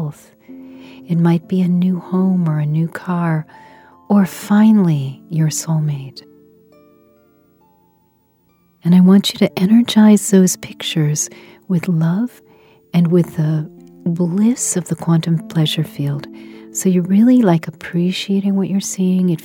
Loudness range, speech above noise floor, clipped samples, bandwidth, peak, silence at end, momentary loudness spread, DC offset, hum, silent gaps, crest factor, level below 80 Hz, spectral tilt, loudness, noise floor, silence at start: 5 LU; 43 dB; under 0.1%; 17 kHz; 0 dBFS; 0.05 s; 12 LU; under 0.1%; none; none; 16 dB; -62 dBFS; -6 dB/octave; -16 LUFS; -58 dBFS; 0 s